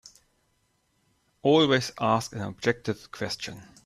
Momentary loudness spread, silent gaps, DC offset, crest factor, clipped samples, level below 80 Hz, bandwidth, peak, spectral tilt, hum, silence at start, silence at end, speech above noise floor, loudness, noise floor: 13 LU; none; under 0.1%; 20 dB; under 0.1%; -62 dBFS; 14 kHz; -8 dBFS; -5 dB/octave; none; 1.45 s; 0.25 s; 45 dB; -26 LUFS; -71 dBFS